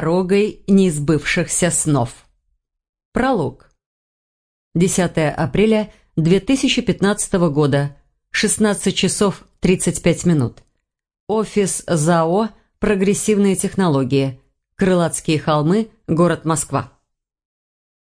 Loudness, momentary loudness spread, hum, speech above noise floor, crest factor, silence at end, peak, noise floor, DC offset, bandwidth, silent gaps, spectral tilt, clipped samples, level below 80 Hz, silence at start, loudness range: -18 LUFS; 7 LU; none; 53 dB; 18 dB; 1.25 s; 0 dBFS; -70 dBFS; under 0.1%; 10.5 kHz; 2.89-2.93 s, 3.05-3.12 s, 3.86-4.71 s, 11.20-11.27 s; -5 dB/octave; under 0.1%; -42 dBFS; 0 s; 3 LU